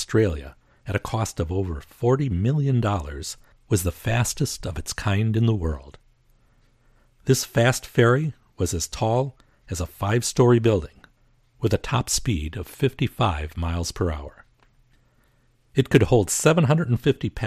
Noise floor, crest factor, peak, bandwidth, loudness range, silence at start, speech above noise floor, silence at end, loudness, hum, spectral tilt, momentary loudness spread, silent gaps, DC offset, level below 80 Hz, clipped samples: -62 dBFS; 20 dB; -2 dBFS; 15 kHz; 4 LU; 0 s; 40 dB; 0 s; -23 LUFS; none; -5.5 dB/octave; 13 LU; none; under 0.1%; -40 dBFS; under 0.1%